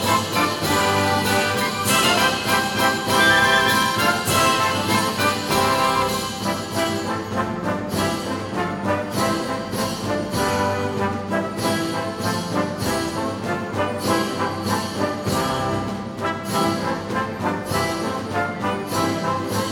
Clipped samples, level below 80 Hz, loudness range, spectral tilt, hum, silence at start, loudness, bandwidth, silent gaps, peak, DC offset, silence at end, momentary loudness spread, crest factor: under 0.1%; -48 dBFS; 6 LU; -3.5 dB/octave; none; 0 s; -21 LUFS; over 20 kHz; none; -4 dBFS; under 0.1%; 0 s; 8 LU; 18 dB